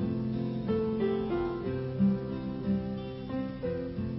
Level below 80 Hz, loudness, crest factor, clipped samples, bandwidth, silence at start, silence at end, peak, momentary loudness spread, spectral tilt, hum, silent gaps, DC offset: -50 dBFS; -32 LUFS; 14 dB; under 0.1%; 5.8 kHz; 0 s; 0 s; -18 dBFS; 7 LU; -12 dB/octave; none; none; under 0.1%